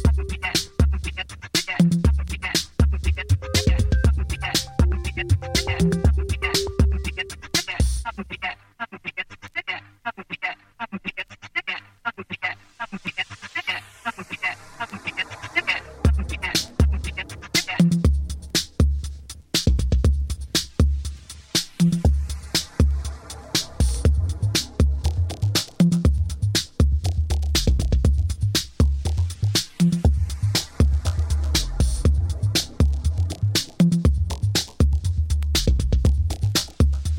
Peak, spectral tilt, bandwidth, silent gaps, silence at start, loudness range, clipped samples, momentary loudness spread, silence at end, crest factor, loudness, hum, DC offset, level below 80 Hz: -4 dBFS; -4.5 dB/octave; 16.5 kHz; none; 0 s; 8 LU; under 0.1%; 11 LU; 0 s; 18 dB; -23 LUFS; none; under 0.1%; -26 dBFS